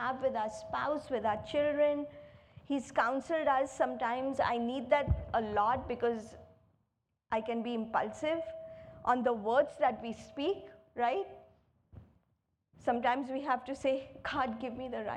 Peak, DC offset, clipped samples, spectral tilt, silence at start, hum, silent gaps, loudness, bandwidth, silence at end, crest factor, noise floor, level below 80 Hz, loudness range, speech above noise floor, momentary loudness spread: -14 dBFS; under 0.1%; under 0.1%; -6 dB/octave; 0 s; none; none; -34 LUFS; 10.5 kHz; 0 s; 20 dB; -81 dBFS; -54 dBFS; 5 LU; 48 dB; 9 LU